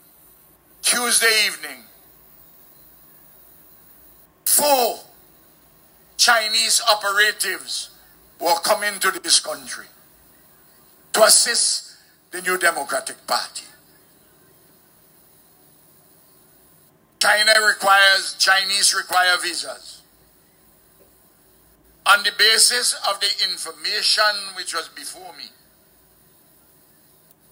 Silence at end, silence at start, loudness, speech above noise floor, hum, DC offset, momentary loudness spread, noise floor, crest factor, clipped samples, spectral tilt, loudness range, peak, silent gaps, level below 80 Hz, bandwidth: 2.05 s; 0.85 s; -17 LUFS; 36 dB; none; under 0.1%; 20 LU; -55 dBFS; 22 dB; under 0.1%; 1.5 dB/octave; 9 LU; 0 dBFS; none; -68 dBFS; 16.5 kHz